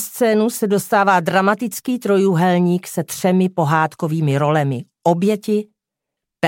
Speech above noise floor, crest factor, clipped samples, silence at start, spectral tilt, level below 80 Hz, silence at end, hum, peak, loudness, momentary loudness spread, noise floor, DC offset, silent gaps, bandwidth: 66 dB; 16 dB; under 0.1%; 0 s; -6 dB/octave; -66 dBFS; 0 s; none; -2 dBFS; -17 LUFS; 7 LU; -82 dBFS; under 0.1%; none; 17 kHz